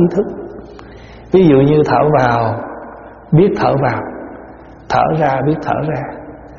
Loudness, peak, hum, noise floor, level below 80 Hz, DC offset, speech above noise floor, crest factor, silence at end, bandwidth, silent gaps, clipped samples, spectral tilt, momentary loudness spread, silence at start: -14 LUFS; 0 dBFS; none; -36 dBFS; -42 dBFS; under 0.1%; 23 dB; 14 dB; 0 s; 7 kHz; none; under 0.1%; -7 dB/octave; 22 LU; 0 s